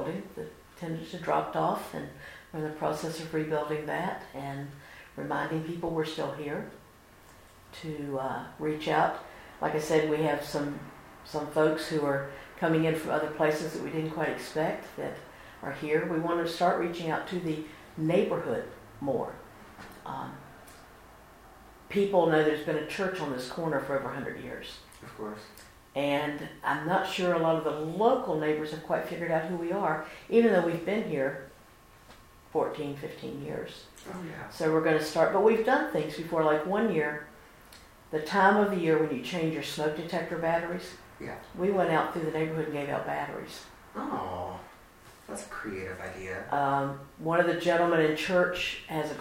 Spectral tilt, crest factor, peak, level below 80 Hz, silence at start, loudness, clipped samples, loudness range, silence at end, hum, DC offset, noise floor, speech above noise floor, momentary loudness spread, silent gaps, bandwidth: -6 dB/octave; 20 dB; -10 dBFS; -60 dBFS; 0 s; -30 LUFS; under 0.1%; 8 LU; 0 s; none; under 0.1%; -55 dBFS; 26 dB; 17 LU; none; 16 kHz